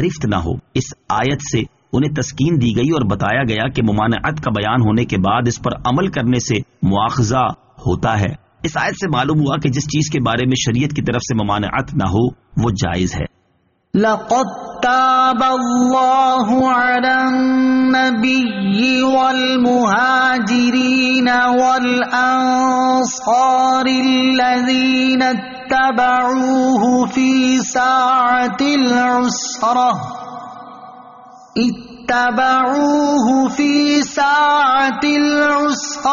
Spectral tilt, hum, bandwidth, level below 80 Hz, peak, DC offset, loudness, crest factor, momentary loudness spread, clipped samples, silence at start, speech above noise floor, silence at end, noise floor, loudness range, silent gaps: -4 dB/octave; none; 7.4 kHz; -42 dBFS; -4 dBFS; under 0.1%; -15 LUFS; 12 dB; 7 LU; under 0.1%; 0 s; 46 dB; 0 s; -61 dBFS; 4 LU; none